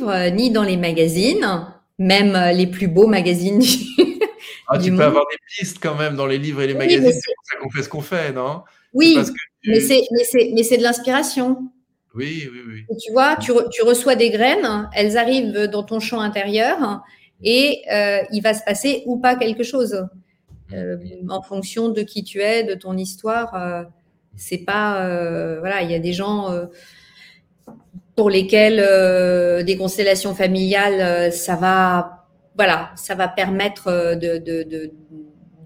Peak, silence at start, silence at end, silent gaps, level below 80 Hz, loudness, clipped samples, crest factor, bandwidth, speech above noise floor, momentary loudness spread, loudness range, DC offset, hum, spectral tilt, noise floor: 0 dBFS; 0 s; 0 s; none; -54 dBFS; -18 LUFS; under 0.1%; 18 dB; 16.5 kHz; 31 dB; 13 LU; 7 LU; under 0.1%; none; -4.5 dB/octave; -49 dBFS